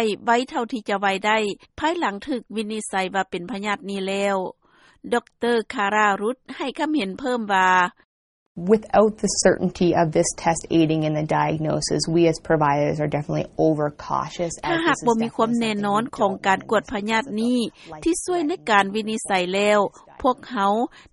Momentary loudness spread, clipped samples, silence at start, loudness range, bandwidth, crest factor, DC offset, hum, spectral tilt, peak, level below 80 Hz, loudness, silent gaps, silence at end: 8 LU; under 0.1%; 0 s; 4 LU; 11.5 kHz; 20 dB; under 0.1%; none; -4.5 dB/octave; -2 dBFS; -52 dBFS; -22 LUFS; 8.05-8.55 s; 0.15 s